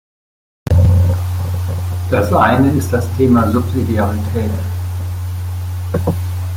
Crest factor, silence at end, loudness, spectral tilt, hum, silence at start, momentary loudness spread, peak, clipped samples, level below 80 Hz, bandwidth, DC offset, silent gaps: 14 dB; 0 s; -16 LUFS; -7.5 dB/octave; none; 0.65 s; 11 LU; -2 dBFS; under 0.1%; -34 dBFS; 16 kHz; under 0.1%; none